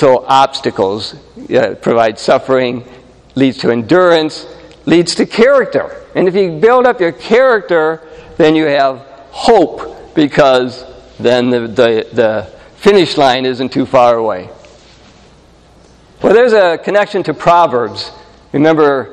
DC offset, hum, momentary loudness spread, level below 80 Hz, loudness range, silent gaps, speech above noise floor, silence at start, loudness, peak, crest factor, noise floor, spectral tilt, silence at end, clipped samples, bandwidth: under 0.1%; none; 12 LU; -46 dBFS; 3 LU; none; 32 dB; 0 s; -11 LUFS; 0 dBFS; 12 dB; -43 dBFS; -5.5 dB/octave; 0 s; 0.3%; 10.5 kHz